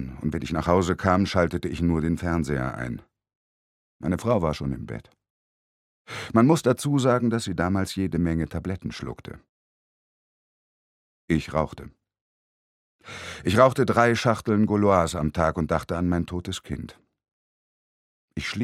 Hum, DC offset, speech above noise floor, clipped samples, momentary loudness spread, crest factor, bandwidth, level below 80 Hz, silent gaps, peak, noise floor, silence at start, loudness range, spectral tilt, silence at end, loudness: none; under 0.1%; over 66 dB; under 0.1%; 17 LU; 24 dB; 15 kHz; -44 dBFS; 3.35-4.00 s, 5.30-6.05 s, 9.49-11.28 s, 12.21-12.99 s, 17.32-18.28 s; -2 dBFS; under -90 dBFS; 0 s; 11 LU; -6.5 dB/octave; 0 s; -24 LUFS